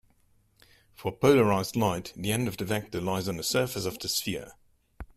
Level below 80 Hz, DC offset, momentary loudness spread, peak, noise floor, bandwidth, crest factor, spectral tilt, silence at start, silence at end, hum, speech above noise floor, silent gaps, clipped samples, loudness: -56 dBFS; under 0.1%; 11 LU; -10 dBFS; -65 dBFS; 16 kHz; 20 dB; -4.5 dB/octave; 1 s; 0.1 s; none; 38 dB; none; under 0.1%; -28 LUFS